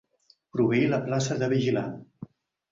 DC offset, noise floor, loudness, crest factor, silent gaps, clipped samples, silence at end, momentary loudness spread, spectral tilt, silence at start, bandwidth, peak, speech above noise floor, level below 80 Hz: under 0.1%; -64 dBFS; -26 LUFS; 16 dB; none; under 0.1%; 0.45 s; 23 LU; -6 dB/octave; 0.55 s; 7.8 kHz; -12 dBFS; 39 dB; -62 dBFS